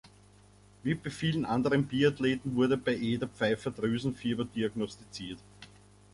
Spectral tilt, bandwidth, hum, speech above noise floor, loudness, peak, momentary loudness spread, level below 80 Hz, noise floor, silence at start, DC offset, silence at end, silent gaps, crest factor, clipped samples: -6.5 dB/octave; 11.5 kHz; 50 Hz at -50 dBFS; 28 dB; -31 LUFS; -14 dBFS; 12 LU; -60 dBFS; -58 dBFS; 0.05 s; under 0.1%; 0.45 s; none; 18 dB; under 0.1%